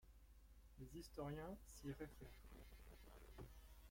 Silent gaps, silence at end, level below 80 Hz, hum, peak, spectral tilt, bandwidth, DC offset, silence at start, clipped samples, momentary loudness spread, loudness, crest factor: none; 0 s; -64 dBFS; none; -40 dBFS; -6 dB/octave; 16.5 kHz; under 0.1%; 0 s; under 0.1%; 13 LU; -58 LUFS; 18 dB